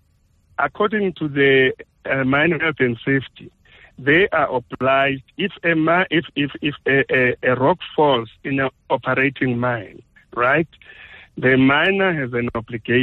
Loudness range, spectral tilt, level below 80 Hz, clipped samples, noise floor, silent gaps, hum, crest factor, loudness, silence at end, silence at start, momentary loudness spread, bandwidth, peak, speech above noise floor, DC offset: 2 LU; -8.5 dB/octave; -52 dBFS; under 0.1%; -59 dBFS; none; none; 14 dB; -19 LUFS; 0 s; 0.6 s; 9 LU; 4.3 kHz; -4 dBFS; 41 dB; under 0.1%